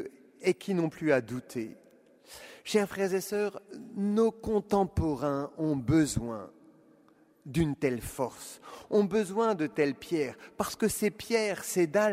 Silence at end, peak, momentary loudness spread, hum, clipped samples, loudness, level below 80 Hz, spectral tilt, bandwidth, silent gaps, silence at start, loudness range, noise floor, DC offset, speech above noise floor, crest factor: 0 s; -12 dBFS; 16 LU; none; under 0.1%; -30 LUFS; -54 dBFS; -5.5 dB/octave; 16 kHz; none; 0 s; 3 LU; -62 dBFS; under 0.1%; 33 dB; 20 dB